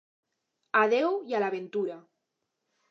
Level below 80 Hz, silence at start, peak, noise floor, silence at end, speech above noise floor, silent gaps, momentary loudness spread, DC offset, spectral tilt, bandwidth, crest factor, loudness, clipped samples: under -90 dBFS; 0.75 s; -10 dBFS; -82 dBFS; 0.9 s; 55 dB; none; 11 LU; under 0.1%; -5.5 dB/octave; 7 kHz; 20 dB; -28 LUFS; under 0.1%